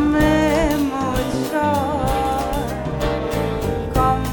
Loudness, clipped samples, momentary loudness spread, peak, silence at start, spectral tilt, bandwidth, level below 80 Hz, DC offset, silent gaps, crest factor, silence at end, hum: -20 LUFS; under 0.1%; 7 LU; -4 dBFS; 0 s; -6 dB/octave; 18 kHz; -30 dBFS; under 0.1%; none; 16 dB; 0 s; none